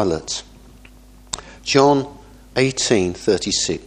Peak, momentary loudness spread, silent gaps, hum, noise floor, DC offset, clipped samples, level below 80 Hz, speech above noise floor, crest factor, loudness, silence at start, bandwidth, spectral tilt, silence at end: 0 dBFS; 16 LU; none; none; -45 dBFS; under 0.1%; under 0.1%; -46 dBFS; 27 dB; 20 dB; -19 LUFS; 0 s; 11 kHz; -3.5 dB/octave; 0 s